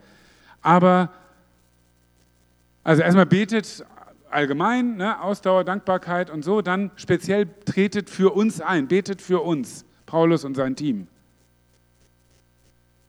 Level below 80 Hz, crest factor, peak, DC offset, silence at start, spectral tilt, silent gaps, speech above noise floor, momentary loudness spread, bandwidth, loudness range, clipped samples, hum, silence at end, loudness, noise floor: -62 dBFS; 22 dB; -2 dBFS; under 0.1%; 0.65 s; -6.5 dB/octave; none; 40 dB; 11 LU; 12 kHz; 5 LU; under 0.1%; 60 Hz at -50 dBFS; 2.05 s; -21 LUFS; -61 dBFS